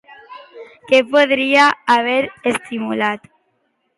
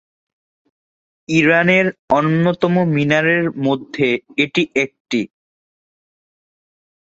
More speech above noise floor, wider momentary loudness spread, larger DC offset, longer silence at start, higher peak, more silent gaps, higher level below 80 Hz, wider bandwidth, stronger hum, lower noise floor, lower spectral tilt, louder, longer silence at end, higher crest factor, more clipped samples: second, 51 dB vs over 74 dB; about the same, 10 LU vs 8 LU; neither; second, 0.1 s vs 1.3 s; about the same, 0 dBFS vs -2 dBFS; second, none vs 1.99-2.08 s, 5.00-5.05 s; second, -64 dBFS vs -56 dBFS; first, 11.5 kHz vs 7.8 kHz; neither; second, -66 dBFS vs under -90 dBFS; second, -3.5 dB/octave vs -6.5 dB/octave; about the same, -15 LUFS vs -16 LUFS; second, 0.8 s vs 1.95 s; about the same, 16 dB vs 18 dB; neither